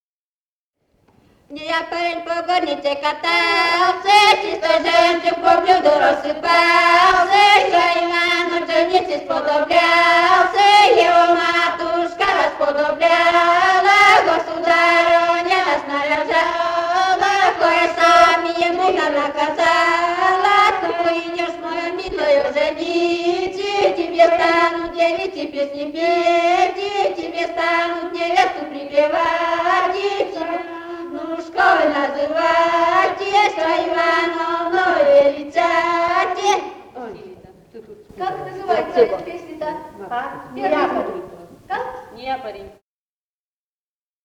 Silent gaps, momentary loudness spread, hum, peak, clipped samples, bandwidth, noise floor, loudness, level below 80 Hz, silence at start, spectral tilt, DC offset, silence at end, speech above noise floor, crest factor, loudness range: none; 14 LU; none; -2 dBFS; under 0.1%; 13.5 kHz; under -90 dBFS; -16 LUFS; -54 dBFS; 1.5 s; -2.5 dB/octave; under 0.1%; 1.55 s; over 73 dB; 16 dB; 9 LU